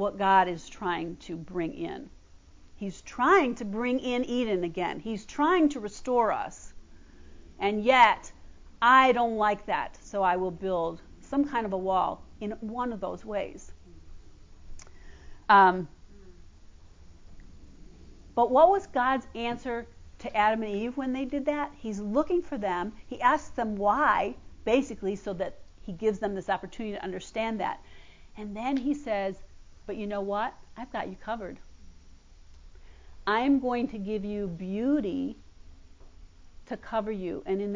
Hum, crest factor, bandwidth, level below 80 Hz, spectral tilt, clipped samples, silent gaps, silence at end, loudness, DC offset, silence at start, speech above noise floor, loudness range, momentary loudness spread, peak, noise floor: none; 22 dB; 7.6 kHz; -54 dBFS; -5.5 dB/octave; under 0.1%; none; 0 s; -28 LUFS; under 0.1%; 0 s; 25 dB; 9 LU; 16 LU; -6 dBFS; -52 dBFS